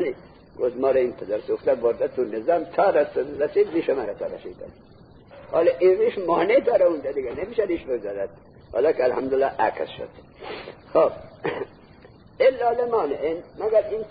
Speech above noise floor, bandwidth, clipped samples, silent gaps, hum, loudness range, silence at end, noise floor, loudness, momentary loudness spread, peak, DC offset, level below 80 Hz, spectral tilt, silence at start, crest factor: 26 dB; 5 kHz; under 0.1%; none; none; 3 LU; 0 s; -49 dBFS; -23 LUFS; 16 LU; -8 dBFS; under 0.1%; -56 dBFS; -10 dB/octave; 0 s; 16 dB